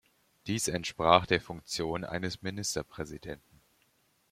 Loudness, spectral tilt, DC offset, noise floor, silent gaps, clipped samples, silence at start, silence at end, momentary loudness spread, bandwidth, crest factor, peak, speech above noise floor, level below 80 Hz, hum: -31 LUFS; -3.5 dB/octave; under 0.1%; -71 dBFS; none; under 0.1%; 0.45 s; 0.95 s; 18 LU; 16.5 kHz; 28 dB; -4 dBFS; 39 dB; -58 dBFS; none